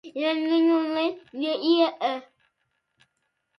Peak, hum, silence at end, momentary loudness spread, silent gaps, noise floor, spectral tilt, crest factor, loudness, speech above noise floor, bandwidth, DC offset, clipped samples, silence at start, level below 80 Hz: -8 dBFS; none; 1.4 s; 8 LU; none; -76 dBFS; -4.5 dB/octave; 18 dB; -24 LUFS; 52 dB; 6 kHz; under 0.1%; under 0.1%; 0.05 s; -80 dBFS